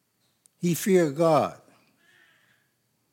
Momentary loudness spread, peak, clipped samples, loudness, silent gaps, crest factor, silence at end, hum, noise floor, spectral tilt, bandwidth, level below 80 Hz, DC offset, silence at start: 9 LU; -10 dBFS; under 0.1%; -24 LUFS; none; 18 dB; 1.6 s; none; -72 dBFS; -6 dB/octave; 17 kHz; -78 dBFS; under 0.1%; 0.6 s